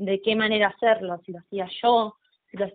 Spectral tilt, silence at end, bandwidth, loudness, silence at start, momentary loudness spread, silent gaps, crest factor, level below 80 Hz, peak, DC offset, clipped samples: -2 dB/octave; 0.05 s; 4.6 kHz; -23 LUFS; 0 s; 13 LU; none; 16 dB; -68 dBFS; -8 dBFS; under 0.1%; under 0.1%